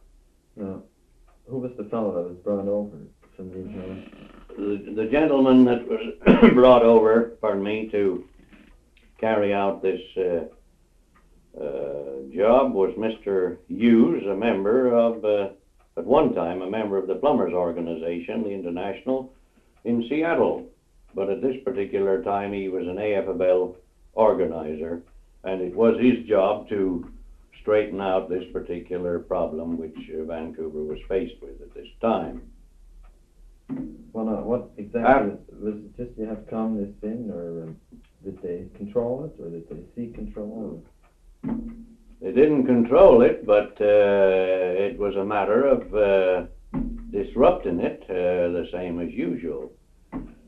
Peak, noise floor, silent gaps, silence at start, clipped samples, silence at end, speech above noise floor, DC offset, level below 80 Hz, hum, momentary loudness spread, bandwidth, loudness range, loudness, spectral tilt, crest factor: 0 dBFS; -59 dBFS; none; 0.55 s; under 0.1%; 0.15 s; 36 dB; under 0.1%; -48 dBFS; none; 18 LU; 4.9 kHz; 13 LU; -23 LUFS; -8.5 dB/octave; 22 dB